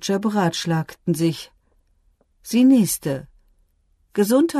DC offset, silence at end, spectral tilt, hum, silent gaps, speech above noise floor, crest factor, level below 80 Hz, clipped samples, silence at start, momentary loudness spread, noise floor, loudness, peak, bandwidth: under 0.1%; 0 s; -5.5 dB/octave; none; none; 44 dB; 16 dB; -58 dBFS; under 0.1%; 0 s; 16 LU; -63 dBFS; -20 LUFS; -6 dBFS; 13.5 kHz